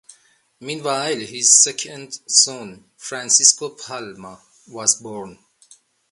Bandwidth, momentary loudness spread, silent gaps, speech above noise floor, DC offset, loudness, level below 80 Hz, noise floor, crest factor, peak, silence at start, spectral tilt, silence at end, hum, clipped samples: 11.5 kHz; 23 LU; none; 34 dB; under 0.1%; -15 LUFS; -70 dBFS; -55 dBFS; 22 dB; 0 dBFS; 0.6 s; 0 dB/octave; 0.8 s; none; under 0.1%